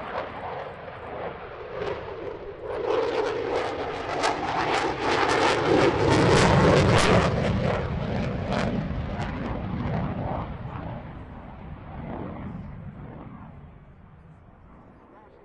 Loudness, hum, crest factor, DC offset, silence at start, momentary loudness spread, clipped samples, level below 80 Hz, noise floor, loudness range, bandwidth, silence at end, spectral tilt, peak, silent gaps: -25 LUFS; none; 22 dB; under 0.1%; 0 s; 21 LU; under 0.1%; -42 dBFS; -51 dBFS; 19 LU; 11.5 kHz; 0.2 s; -5.5 dB/octave; -4 dBFS; none